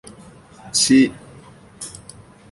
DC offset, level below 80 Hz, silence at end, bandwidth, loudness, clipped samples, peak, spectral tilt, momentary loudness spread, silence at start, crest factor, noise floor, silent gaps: under 0.1%; -56 dBFS; 0.65 s; 11.5 kHz; -16 LUFS; under 0.1%; -4 dBFS; -2.5 dB/octave; 21 LU; 0.65 s; 18 dB; -44 dBFS; none